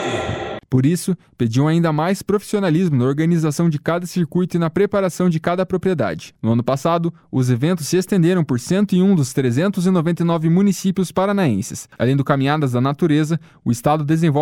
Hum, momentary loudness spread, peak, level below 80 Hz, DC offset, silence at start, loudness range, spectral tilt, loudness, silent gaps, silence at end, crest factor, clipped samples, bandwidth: none; 6 LU; -2 dBFS; -52 dBFS; under 0.1%; 0 s; 2 LU; -7 dB/octave; -18 LUFS; none; 0 s; 14 dB; under 0.1%; 16 kHz